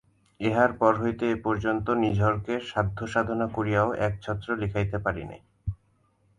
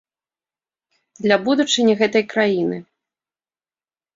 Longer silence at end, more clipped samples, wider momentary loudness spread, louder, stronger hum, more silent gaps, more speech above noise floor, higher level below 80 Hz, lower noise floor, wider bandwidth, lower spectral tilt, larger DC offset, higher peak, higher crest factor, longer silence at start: second, 0.65 s vs 1.35 s; neither; first, 13 LU vs 9 LU; second, -27 LUFS vs -18 LUFS; neither; neither; second, 41 dB vs over 72 dB; first, -46 dBFS vs -66 dBFS; second, -67 dBFS vs under -90 dBFS; first, 10 kHz vs 7.8 kHz; first, -7.5 dB/octave vs -4 dB/octave; neither; second, -6 dBFS vs -2 dBFS; about the same, 22 dB vs 20 dB; second, 0.4 s vs 1.2 s